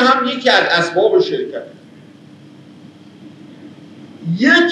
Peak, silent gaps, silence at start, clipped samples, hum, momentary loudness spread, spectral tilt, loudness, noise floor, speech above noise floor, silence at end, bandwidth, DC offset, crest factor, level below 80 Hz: 0 dBFS; none; 0 s; under 0.1%; none; 17 LU; -4.5 dB/octave; -14 LUFS; -41 dBFS; 27 dB; 0 s; 9.8 kHz; under 0.1%; 16 dB; -88 dBFS